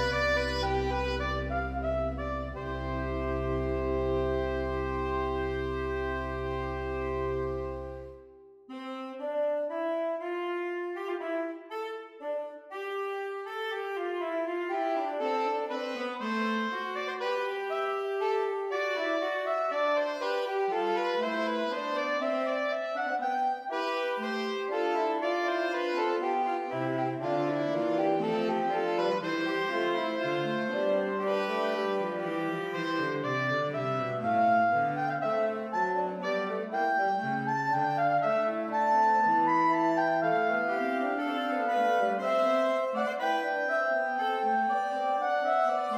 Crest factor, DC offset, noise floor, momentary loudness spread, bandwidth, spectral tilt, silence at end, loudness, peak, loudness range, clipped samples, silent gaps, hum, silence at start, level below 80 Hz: 14 dB; under 0.1%; -53 dBFS; 7 LU; 15 kHz; -6 dB/octave; 0 s; -30 LUFS; -16 dBFS; 8 LU; under 0.1%; none; none; 0 s; -46 dBFS